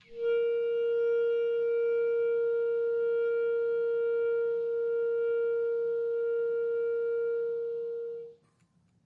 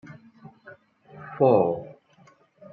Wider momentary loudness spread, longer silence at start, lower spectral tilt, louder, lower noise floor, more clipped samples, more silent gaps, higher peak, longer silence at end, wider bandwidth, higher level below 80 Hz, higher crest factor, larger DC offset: second, 5 LU vs 26 LU; about the same, 0.1 s vs 0.1 s; second, -6 dB/octave vs -10 dB/octave; second, -30 LUFS vs -22 LUFS; first, -68 dBFS vs -58 dBFS; neither; neither; second, -24 dBFS vs -6 dBFS; about the same, 0.75 s vs 0.8 s; second, 3.9 kHz vs 4.5 kHz; second, -80 dBFS vs -74 dBFS; second, 6 dB vs 20 dB; neither